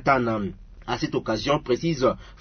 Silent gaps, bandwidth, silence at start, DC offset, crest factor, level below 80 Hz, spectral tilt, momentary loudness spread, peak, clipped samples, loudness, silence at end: none; 6.6 kHz; 0 s; under 0.1%; 20 dB; -46 dBFS; -6 dB/octave; 9 LU; -6 dBFS; under 0.1%; -25 LUFS; 0.05 s